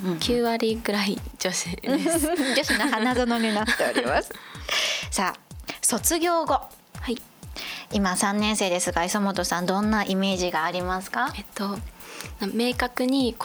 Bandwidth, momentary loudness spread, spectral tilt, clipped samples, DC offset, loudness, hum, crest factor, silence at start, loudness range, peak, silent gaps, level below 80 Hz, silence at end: over 20 kHz; 11 LU; -3.5 dB/octave; under 0.1%; under 0.1%; -24 LUFS; none; 18 dB; 0 s; 3 LU; -6 dBFS; none; -44 dBFS; 0 s